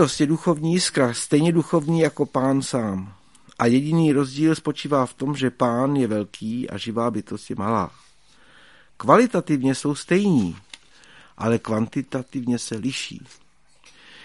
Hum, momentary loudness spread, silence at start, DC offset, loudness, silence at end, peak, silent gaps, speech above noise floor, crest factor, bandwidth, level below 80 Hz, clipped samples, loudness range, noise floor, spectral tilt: none; 10 LU; 0 s; 0.2%; -22 LUFS; 0 s; 0 dBFS; none; 35 dB; 22 dB; 11.5 kHz; -60 dBFS; under 0.1%; 5 LU; -56 dBFS; -6 dB/octave